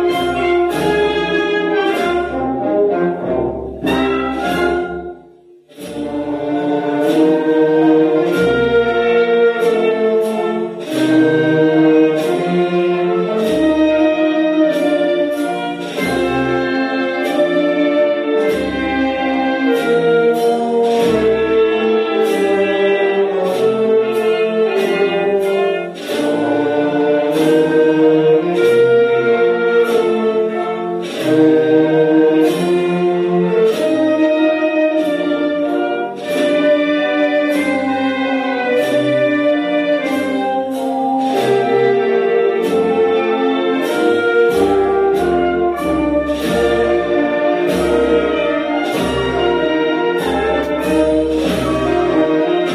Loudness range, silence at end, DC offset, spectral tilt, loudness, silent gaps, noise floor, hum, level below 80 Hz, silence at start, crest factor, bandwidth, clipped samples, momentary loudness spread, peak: 3 LU; 0 s; under 0.1%; -6 dB/octave; -15 LUFS; none; -44 dBFS; none; -42 dBFS; 0 s; 14 dB; 14.5 kHz; under 0.1%; 6 LU; -2 dBFS